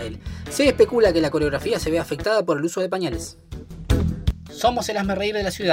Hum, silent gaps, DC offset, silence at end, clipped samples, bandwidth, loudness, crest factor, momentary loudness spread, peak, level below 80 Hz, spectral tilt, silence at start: none; none; under 0.1%; 0 s; under 0.1%; 16 kHz; -22 LUFS; 18 dB; 15 LU; -4 dBFS; -34 dBFS; -5 dB/octave; 0 s